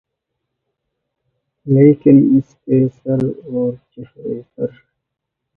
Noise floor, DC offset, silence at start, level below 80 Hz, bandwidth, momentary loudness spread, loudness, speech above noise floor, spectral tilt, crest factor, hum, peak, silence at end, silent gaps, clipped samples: -79 dBFS; under 0.1%; 1.65 s; -56 dBFS; 3 kHz; 17 LU; -15 LUFS; 64 dB; -12 dB/octave; 16 dB; none; 0 dBFS; 0.9 s; none; under 0.1%